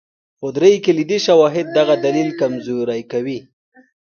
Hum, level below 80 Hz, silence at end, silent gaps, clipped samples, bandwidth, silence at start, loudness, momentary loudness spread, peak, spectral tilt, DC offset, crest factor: none; -64 dBFS; 0.75 s; none; under 0.1%; 6.8 kHz; 0.4 s; -16 LUFS; 12 LU; 0 dBFS; -5.5 dB/octave; under 0.1%; 16 dB